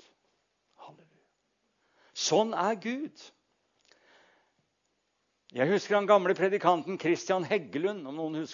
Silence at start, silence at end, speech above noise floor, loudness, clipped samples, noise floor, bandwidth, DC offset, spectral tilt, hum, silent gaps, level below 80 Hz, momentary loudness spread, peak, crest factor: 0.8 s; 0 s; 49 dB; -28 LUFS; under 0.1%; -77 dBFS; 7.4 kHz; under 0.1%; -4.5 dB/octave; none; none; -86 dBFS; 12 LU; -10 dBFS; 22 dB